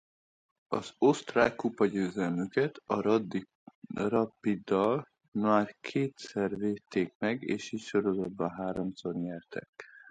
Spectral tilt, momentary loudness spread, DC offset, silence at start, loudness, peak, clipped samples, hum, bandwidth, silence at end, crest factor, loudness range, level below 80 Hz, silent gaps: -6.5 dB/octave; 10 LU; under 0.1%; 0.7 s; -31 LUFS; -10 dBFS; under 0.1%; none; 9.2 kHz; 0.1 s; 22 dB; 3 LU; -66 dBFS; 3.55-3.67 s, 3.75-3.82 s, 5.28-5.32 s, 7.15-7.20 s, 9.69-9.73 s